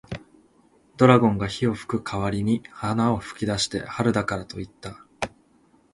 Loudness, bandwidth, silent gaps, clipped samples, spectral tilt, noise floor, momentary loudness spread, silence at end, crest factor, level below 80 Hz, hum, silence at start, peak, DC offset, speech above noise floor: -24 LUFS; 11.5 kHz; none; under 0.1%; -6 dB/octave; -60 dBFS; 19 LU; 0.65 s; 24 dB; -50 dBFS; none; 0.1 s; -2 dBFS; under 0.1%; 37 dB